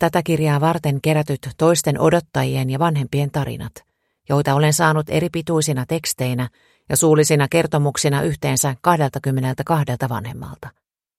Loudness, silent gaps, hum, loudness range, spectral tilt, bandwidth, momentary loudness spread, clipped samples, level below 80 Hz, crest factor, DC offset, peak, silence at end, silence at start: -19 LUFS; none; none; 2 LU; -5 dB/octave; 16 kHz; 10 LU; under 0.1%; -50 dBFS; 18 dB; under 0.1%; 0 dBFS; 0.5 s; 0 s